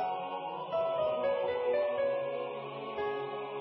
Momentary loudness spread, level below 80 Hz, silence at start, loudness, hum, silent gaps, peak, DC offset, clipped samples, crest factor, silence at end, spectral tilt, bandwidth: 8 LU; -70 dBFS; 0 s; -34 LUFS; none; none; -20 dBFS; under 0.1%; under 0.1%; 12 dB; 0 s; -2.5 dB/octave; 5.6 kHz